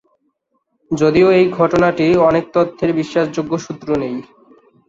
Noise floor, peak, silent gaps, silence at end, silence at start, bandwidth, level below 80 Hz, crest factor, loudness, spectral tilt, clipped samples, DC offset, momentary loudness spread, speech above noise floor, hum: -68 dBFS; -2 dBFS; none; 0.65 s; 0.9 s; 7.6 kHz; -48 dBFS; 14 dB; -15 LUFS; -7 dB/octave; under 0.1%; under 0.1%; 11 LU; 53 dB; none